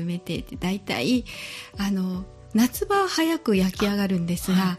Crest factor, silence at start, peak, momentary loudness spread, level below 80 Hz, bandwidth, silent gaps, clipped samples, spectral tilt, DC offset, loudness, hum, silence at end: 16 dB; 0 s; -10 dBFS; 10 LU; -46 dBFS; 15 kHz; none; under 0.1%; -5.5 dB/octave; under 0.1%; -25 LUFS; none; 0 s